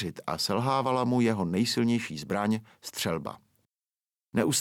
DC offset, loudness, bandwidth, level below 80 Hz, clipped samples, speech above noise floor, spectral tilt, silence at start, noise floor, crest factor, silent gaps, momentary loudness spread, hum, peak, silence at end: under 0.1%; -28 LUFS; 17 kHz; -64 dBFS; under 0.1%; over 62 dB; -4.5 dB/octave; 0 s; under -90 dBFS; 18 dB; none; 8 LU; none; -10 dBFS; 0 s